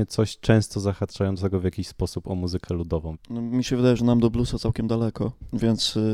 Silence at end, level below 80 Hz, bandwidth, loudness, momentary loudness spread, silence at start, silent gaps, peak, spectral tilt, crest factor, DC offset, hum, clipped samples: 0 s; -40 dBFS; 14 kHz; -25 LUFS; 9 LU; 0 s; none; -2 dBFS; -6.5 dB/octave; 20 dB; under 0.1%; none; under 0.1%